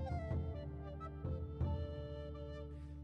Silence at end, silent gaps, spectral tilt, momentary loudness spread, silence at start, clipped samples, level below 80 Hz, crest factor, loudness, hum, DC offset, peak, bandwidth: 0 s; none; -9.5 dB/octave; 7 LU; 0 s; under 0.1%; -48 dBFS; 14 dB; -45 LUFS; none; under 0.1%; -28 dBFS; 5.8 kHz